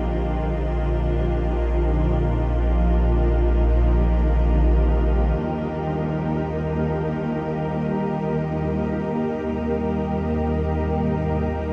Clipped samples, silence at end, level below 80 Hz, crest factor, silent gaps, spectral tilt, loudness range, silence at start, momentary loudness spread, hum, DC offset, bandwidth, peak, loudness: under 0.1%; 0 s; -22 dBFS; 12 dB; none; -10 dB/octave; 4 LU; 0 s; 5 LU; none; under 0.1%; 3.7 kHz; -8 dBFS; -23 LUFS